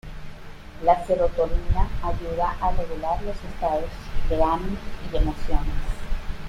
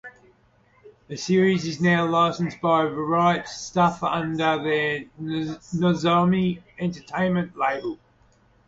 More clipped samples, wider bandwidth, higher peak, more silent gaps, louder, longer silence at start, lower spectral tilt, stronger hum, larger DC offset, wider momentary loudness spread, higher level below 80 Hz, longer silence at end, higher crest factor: neither; first, 9.4 kHz vs 7.8 kHz; first, -4 dBFS vs -8 dBFS; neither; second, -26 LUFS vs -23 LUFS; about the same, 0.05 s vs 0.05 s; about the same, -7 dB/octave vs -6 dB/octave; neither; neither; first, 13 LU vs 10 LU; first, -28 dBFS vs -58 dBFS; second, 0 s vs 0.7 s; about the same, 18 dB vs 16 dB